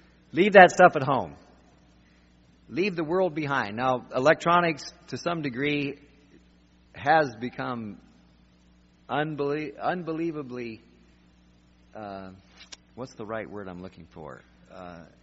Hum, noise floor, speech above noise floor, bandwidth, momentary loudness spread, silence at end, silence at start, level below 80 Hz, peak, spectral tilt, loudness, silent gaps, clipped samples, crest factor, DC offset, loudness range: none; -59 dBFS; 34 dB; 7.6 kHz; 25 LU; 0.2 s; 0.35 s; -62 dBFS; 0 dBFS; -4 dB/octave; -24 LUFS; none; under 0.1%; 28 dB; under 0.1%; 17 LU